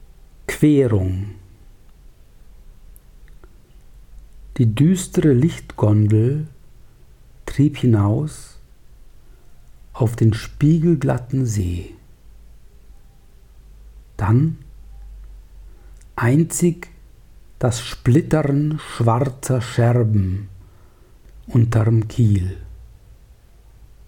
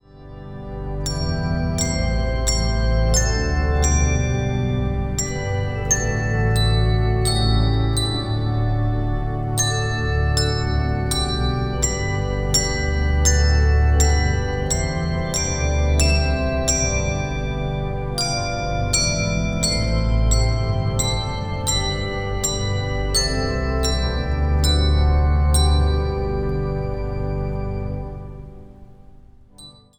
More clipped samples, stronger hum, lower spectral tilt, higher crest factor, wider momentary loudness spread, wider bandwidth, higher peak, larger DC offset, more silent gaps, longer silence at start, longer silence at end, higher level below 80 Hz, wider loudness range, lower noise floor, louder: neither; neither; first, -7.5 dB/octave vs -4 dB/octave; about the same, 16 dB vs 16 dB; first, 17 LU vs 7 LU; second, 17 kHz vs 19.5 kHz; about the same, -4 dBFS vs -4 dBFS; neither; neither; first, 0.5 s vs 0.15 s; first, 1.2 s vs 0.3 s; second, -42 dBFS vs -24 dBFS; first, 7 LU vs 3 LU; about the same, -47 dBFS vs -45 dBFS; about the same, -19 LUFS vs -21 LUFS